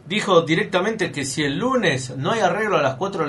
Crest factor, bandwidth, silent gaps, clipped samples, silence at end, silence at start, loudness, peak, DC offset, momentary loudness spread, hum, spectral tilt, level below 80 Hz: 18 dB; 11.5 kHz; none; under 0.1%; 0 s; 0.05 s; -20 LUFS; -2 dBFS; under 0.1%; 6 LU; none; -4.5 dB/octave; -56 dBFS